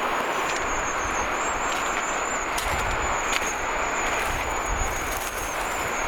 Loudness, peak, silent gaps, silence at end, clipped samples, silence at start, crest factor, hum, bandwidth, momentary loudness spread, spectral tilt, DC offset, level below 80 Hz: -25 LUFS; -6 dBFS; none; 0 s; under 0.1%; 0 s; 20 dB; none; over 20 kHz; 2 LU; -2 dB/octave; under 0.1%; -38 dBFS